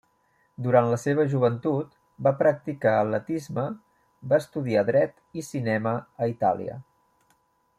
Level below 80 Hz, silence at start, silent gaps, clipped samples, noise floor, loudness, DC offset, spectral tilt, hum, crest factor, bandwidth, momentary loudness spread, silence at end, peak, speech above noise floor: -68 dBFS; 0.6 s; none; under 0.1%; -67 dBFS; -25 LUFS; under 0.1%; -7.5 dB/octave; none; 20 dB; 14.5 kHz; 12 LU; 0.95 s; -6 dBFS; 43 dB